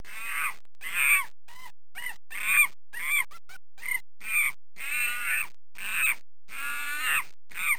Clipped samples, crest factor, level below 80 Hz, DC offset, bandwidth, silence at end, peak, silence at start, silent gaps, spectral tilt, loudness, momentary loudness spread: under 0.1%; 18 dB; -68 dBFS; 2%; over 20 kHz; 0 s; -12 dBFS; 0.05 s; none; 1.5 dB/octave; -27 LUFS; 16 LU